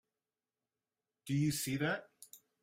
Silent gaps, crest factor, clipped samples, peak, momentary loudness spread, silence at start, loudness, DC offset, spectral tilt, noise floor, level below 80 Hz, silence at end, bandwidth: none; 18 dB; under 0.1%; -22 dBFS; 22 LU; 1.25 s; -36 LUFS; under 0.1%; -5 dB/octave; under -90 dBFS; -72 dBFS; 0.25 s; 16 kHz